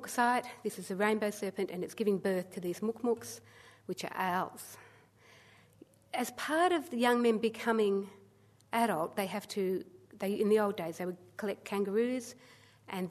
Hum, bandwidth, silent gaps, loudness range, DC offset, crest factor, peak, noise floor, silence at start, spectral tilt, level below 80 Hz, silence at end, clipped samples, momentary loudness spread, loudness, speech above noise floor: none; 13.5 kHz; none; 7 LU; under 0.1%; 18 dB; -16 dBFS; -63 dBFS; 0 s; -5 dB/octave; -80 dBFS; 0 s; under 0.1%; 12 LU; -33 LUFS; 30 dB